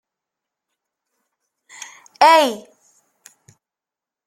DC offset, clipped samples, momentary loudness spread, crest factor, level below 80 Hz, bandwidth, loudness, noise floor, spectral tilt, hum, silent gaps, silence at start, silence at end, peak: under 0.1%; under 0.1%; 25 LU; 22 dB; -72 dBFS; 15 kHz; -14 LUFS; -88 dBFS; -1.5 dB/octave; none; none; 2.2 s; 1.65 s; 0 dBFS